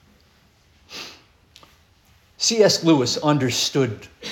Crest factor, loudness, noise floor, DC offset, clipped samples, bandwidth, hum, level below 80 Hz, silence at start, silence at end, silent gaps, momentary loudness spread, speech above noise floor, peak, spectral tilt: 20 dB; -19 LUFS; -57 dBFS; under 0.1%; under 0.1%; 17 kHz; none; -60 dBFS; 0.9 s; 0 s; none; 20 LU; 38 dB; -4 dBFS; -4 dB/octave